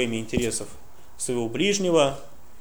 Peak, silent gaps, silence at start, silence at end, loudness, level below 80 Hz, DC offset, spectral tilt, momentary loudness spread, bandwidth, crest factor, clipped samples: -6 dBFS; none; 0 s; 0.35 s; -25 LUFS; -48 dBFS; 1%; -4 dB/octave; 13 LU; over 20 kHz; 18 dB; under 0.1%